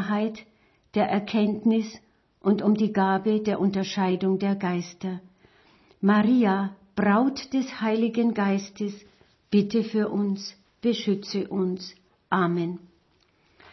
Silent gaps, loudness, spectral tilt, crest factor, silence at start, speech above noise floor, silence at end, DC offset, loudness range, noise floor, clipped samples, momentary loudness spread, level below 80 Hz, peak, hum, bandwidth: none; -25 LUFS; -7 dB/octave; 18 dB; 0 s; 40 dB; 0.95 s; under 0.1%; 3 LU; -65 dBFS; under 0.1%; 12 LU; -66 dBFS; -8 dBFS; none; 6.2 kHz